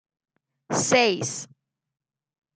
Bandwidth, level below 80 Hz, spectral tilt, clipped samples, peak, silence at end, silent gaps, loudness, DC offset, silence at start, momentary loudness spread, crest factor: 10 kHz; -72 dBFS; -3 dB/octave; under 0.1%; -4 dBFS; 1.1 s; none; -22 LUFS; under 0.1%; 0.7 s; 16 LU; 22 dB